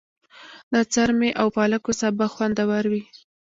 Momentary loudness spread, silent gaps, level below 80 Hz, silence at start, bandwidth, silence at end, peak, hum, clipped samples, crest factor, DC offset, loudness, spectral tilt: 4 LU; 0.63-0.71 s; -54 dBFS; 0.4 s; 7.8 kHz; 0.4 s; -4 dBFS; none; under 0.1%; 18 dB; under 0.1%; -22 LUFS; -4.5 dB/octave